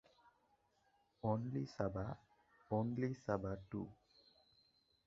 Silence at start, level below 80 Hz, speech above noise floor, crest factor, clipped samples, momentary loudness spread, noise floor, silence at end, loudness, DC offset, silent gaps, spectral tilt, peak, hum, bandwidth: 1.25 s; -66 dBFS; 36 dB; 22 dB; under 0.1%; 8 LU; -78 dBFS; 1.1 s; -43 LUFS; under 0.1%; none; -8 dB/octave; -22 dBFS; none; 7.4 kHz